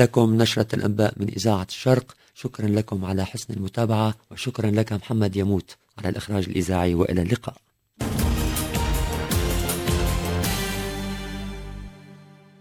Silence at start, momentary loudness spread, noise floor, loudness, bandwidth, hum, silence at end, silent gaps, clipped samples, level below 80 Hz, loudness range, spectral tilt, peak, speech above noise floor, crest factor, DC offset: 0 s; 11 LU; -48 dBFS; -24 LUFS; 16 kHz; none; 0.35 s; none; under 0.1%; -34 dBFS; 2 LU; -5.5 dB/octave; -2 dBFS; 25 dB; 22 dB; under 0.1%